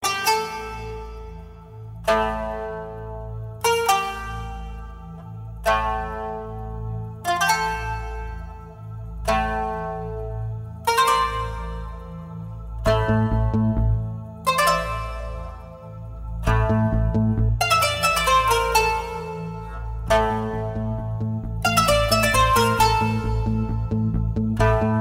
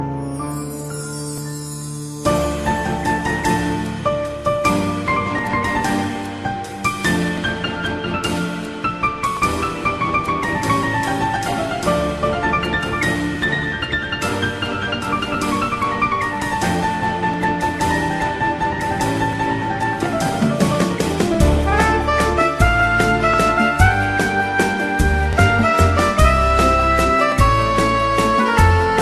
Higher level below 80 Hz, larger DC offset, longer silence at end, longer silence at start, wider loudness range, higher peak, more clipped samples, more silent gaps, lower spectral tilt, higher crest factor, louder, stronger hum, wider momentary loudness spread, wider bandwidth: about the same, -32 dBFS vs -28 dBFS; neither; about the same, 0 s vs 0 s; about the same, 0 s vs 0 s; about the same, 7 LU vs 6 LU; second, -6 dBFS vs 0 dBFS; neither; neither; about the same, -4.5 dB/octave vs -5 dB/octave; about the same, 18 dB vs 18 dB; second, -22 LUFS vs -18 LUFS; neither; first, 18 LU vs 8 LU; first, 16 kHz vs 14.5 kHz